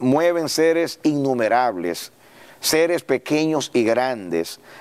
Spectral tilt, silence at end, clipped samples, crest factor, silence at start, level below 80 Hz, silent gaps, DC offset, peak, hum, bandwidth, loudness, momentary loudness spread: -4 dB/octave; 0 s; under 0.1%; 14 dB; 0 s; -66 dBFS; none; under 0.1%; -6 dBFS; none; 16 kHz; -20 LUFS; 8 LU